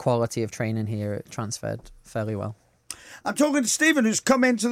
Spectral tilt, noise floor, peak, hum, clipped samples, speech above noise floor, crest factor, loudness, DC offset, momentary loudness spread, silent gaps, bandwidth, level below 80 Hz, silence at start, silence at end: -4.5 dB/octave; -43 dBFS; -8 dBFS; none; under 0.1%; 19 dB; 16 dB; -24 LUFS; under 0.1%; 16 LU; none; 16.5 kHz; -58 dBFS; 0 s; 0 s